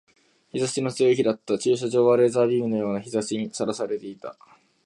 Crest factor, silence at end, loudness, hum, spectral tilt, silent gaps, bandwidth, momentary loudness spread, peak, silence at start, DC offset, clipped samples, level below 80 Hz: 16 dB; 0.55 s; -23 LUFS; none; -5.5 dB/octave; none; 11.5 kHz; 13 LU; -8 dBFS; 0.55 s; under 0.1%; under 0.1%; -68 dBFS